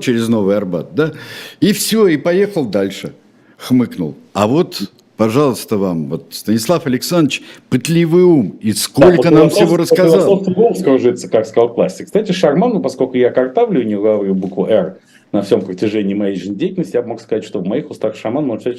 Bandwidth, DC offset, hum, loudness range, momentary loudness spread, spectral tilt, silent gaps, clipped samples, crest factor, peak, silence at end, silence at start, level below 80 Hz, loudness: 16.5 kHz; under 0.1%; none; 6 LU; 11 LU; -6 dB/octave; none; 0.1%; 14 dB; 0 dBFS; 0 s; 0 s; -50 dBFS; -14 LUFS